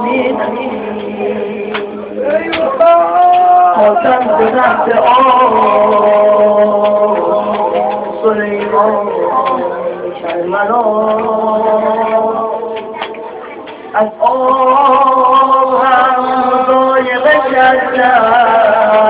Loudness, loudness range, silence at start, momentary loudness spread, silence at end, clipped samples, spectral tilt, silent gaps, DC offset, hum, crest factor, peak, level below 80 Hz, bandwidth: -10 LUFS; 5 LU; 0 s; 11 LU; 0 s; 0.2%; -8.5 dB/octave; none; under 0.1%; none; 10 dB; 0 dBFS; -50 dBFS; 4 kHz